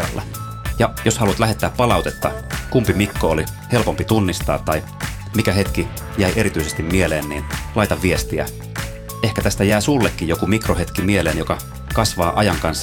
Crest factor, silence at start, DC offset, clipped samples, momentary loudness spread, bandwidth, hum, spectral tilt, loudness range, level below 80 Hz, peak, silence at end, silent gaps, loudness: 18 dB; 0 s; under 0.1%; under 0.1%; 9 LU; 19.5 kHz; none; -5 dB/octave; 2 LU; -30 dBFS; -2 dBFS; 0 s; none; -19 LUFS